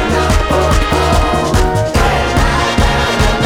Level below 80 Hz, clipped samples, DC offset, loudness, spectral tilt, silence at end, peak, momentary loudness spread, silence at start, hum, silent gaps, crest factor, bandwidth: -16 dBFS; under 0.1%; under 0.1%; -13 LUFS; -5 dB/octave; 0 s; 0 dBFS; 1 LU; 0 s; none; none; 12 dB; 17 kHz